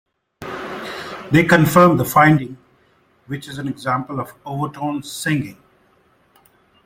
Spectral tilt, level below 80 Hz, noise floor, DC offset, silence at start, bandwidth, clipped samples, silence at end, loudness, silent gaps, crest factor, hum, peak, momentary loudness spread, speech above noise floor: -6 dB/octave; -50 dBFS; -58 dBFS; under 0.1%; 0.4 s; 16.5 kHz; under 0.1%; 1.3 s; -18 LUFS; none; 18 dB; none; 0 dBFS; 18 LU; 41 dB